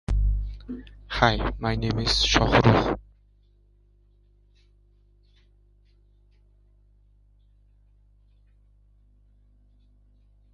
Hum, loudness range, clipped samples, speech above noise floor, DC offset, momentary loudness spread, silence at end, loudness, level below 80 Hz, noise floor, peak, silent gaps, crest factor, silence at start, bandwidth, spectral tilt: 50 Hz at -45 dBFS; 6 LU; under 0.1%; 37 dB; under 0.1%; 18 LU; 7.55 s; -23 LUFS; -34 dBFS; -59 dBFS; 0 dBFS; none; 28 dB; 0.1 s; 11.5 kHz; -5 dB/octave